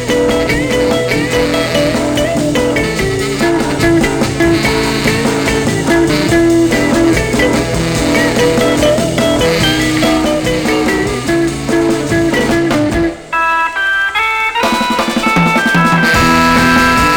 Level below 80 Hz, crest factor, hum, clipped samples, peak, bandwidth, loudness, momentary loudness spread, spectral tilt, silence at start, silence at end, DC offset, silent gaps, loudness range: -28 dBFS; 12 dB; none; under 0.1%; 0 dBFS; 19 kHz; -12 LUFS; 5 LU; -4.5 dB/octave; 0 s; 0 s; 0.2%; none; 2 LU